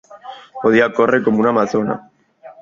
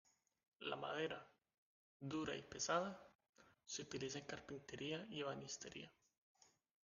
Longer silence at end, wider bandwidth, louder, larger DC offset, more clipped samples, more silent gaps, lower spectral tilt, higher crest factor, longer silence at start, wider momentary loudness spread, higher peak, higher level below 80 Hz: second, 0.1 s vs 0.95 s; second, 7.4 kHz vs 9.6 kHz; first, -16 LUFS vs -48 LUFS; neither; neither; second, none vs 1.58-2.00 s, 3.15-3.19 s, 3.29-3.33 s; first, -6.5 dB/octave vs -3.5 dB/octave; second, 16 dB vs 24 dB; second, 0.1 s vs 0.6 s; first, 20 LU vs 13 LU; first, 0 dBFS vs -26 dBFS; first, -58 dBFS vs -80 dBFS